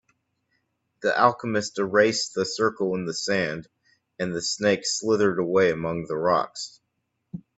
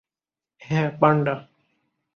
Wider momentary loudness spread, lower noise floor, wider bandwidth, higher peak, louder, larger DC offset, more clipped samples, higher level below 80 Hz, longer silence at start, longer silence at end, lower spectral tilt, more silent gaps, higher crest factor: first, 12 LU vs 9 LU; second, -77 dBFS vs under -90 dBFS; first, 8.4 kHz vs 6.8 kHz; about the same, -4 dBFS vs -4 dBFS; about the same, -24 LUFS vs -22 LUFS; neither; neither; about the same, -64 dBFS vs -64 dBFS; first, 1 s vs 0.7 s; second, 0.15 s vs 0.75 s; second, -4 dB/octave vs -8 dB/octave; neither; about the same, 20 dB vs 22 dB